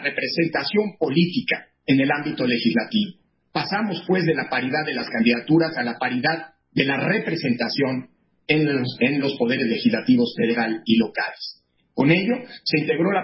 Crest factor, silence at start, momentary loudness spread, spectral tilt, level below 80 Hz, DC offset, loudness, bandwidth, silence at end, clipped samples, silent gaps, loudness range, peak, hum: 18 dB; 0 s; 7 LU; -9.5 dB/octave; -64 dBFS; under 0.1%; -22 LUFS; 5.8 kHz; 0 s; under 0.1%; none; 1 LU; -4 dBFS; none